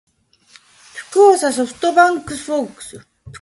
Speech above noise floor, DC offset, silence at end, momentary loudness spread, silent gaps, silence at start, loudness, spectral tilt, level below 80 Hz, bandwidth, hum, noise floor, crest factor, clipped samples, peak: 35 dB; under 0.1%; 0.05 s; 23 LU; none; 0.95 s; -15 LUFS; -3.5 dB/octave; -56 dBFS; 11.5 kHz; none; -51 dBFS; 16 dB; under 0.1%; 0 dBFS